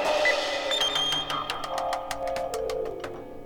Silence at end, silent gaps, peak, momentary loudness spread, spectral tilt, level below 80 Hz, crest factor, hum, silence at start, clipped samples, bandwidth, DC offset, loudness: 0 s; none; -10 dBFS; 9 LU; -1.5 dB/octave; -52 dBFS; 18 dB; none; 0 s; under 0.1%; 19.5 kHz; under 0.1%; -27 LUFS